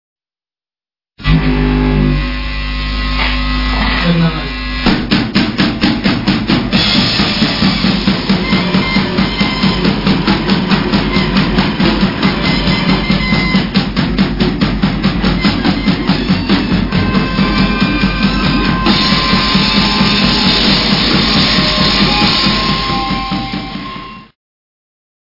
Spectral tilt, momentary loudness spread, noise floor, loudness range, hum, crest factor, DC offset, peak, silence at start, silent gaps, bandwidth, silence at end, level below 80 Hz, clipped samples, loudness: -6 dB/octave; 6 LU; under -90 dBFS; 5 LU; none; 12 dB; 0.6%; 0 dBFS; 1.2 s; none; 5.8 kHz; 1.1 s; -22 dBFS; under 0.1%; -12 LUFS